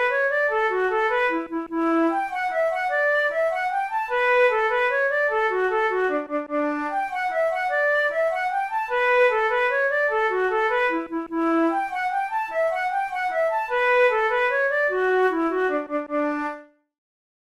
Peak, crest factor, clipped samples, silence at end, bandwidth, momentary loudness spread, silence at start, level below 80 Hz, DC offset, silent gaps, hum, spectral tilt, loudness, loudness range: -8 dBFS; 14 dB; under 0.1%; 0.9 s; 13.5 kHz; 7 LU; 0 s; -58 dBFS; under 0.1%; none; none; -3.5 dB/octave; -22 LUFS; 2 LU